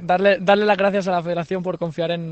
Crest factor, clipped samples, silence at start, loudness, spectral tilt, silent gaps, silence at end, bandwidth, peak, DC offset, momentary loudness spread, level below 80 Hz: 16 dB; under 0.1%; 0 s; -20 LUFS; -6.5 dB/octave; none; 0 s; 8.4 kHz; -4 dBFS; under 0.1%; 9 LU; -58 dBFS